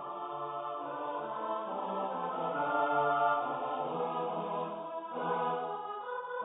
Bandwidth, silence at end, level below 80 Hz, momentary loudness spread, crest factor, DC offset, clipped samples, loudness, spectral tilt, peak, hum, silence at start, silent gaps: 3.9 kHz; 0 s; -84 dBFS; 10 LU; 18 dB; under 0.1%; under 0.1%; -35 LUFS; -0.5 dB/octave; -18 dBFS; none; 0 s; none